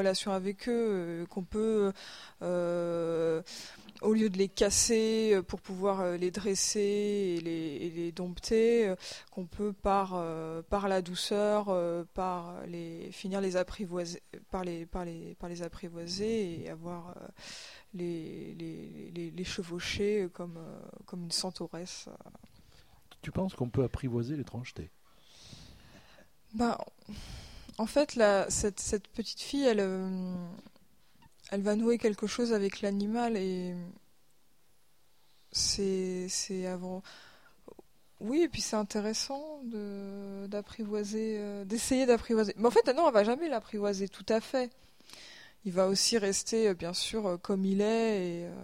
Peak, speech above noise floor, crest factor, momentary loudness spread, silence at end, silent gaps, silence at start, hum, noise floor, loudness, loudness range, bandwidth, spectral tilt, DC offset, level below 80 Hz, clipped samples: -12 dBFS; 39 dB; 20 dB; 17 LU; 0 s; none; 0 s; none; -71 dBFS; -32 LUFS; 9 LU; 16 kHz; -4 dB/octave; 0.1%; -56 dBFS; under 0.1%